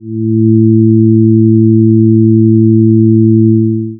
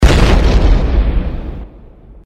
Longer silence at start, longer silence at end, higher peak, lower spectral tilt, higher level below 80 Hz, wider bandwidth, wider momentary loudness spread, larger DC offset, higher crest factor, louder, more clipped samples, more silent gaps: about the same, 0.05 s vs 0 s; second, 0 s vs 0.15 s; about the same, 0 dBFS vs 0 dBFS; first, -27.5 dB/octave vs -6 dB/octave; second, -54 dBFS vs -12 dBFS; second, 0.4 kHz vs 10.5 kHz; second, 2 LU vs 17 LU; neither; second, 6 dB vs 12 dB; first, -8 LUFS vs -14 LUFS; second, under 0.1% vs 0.3%; neither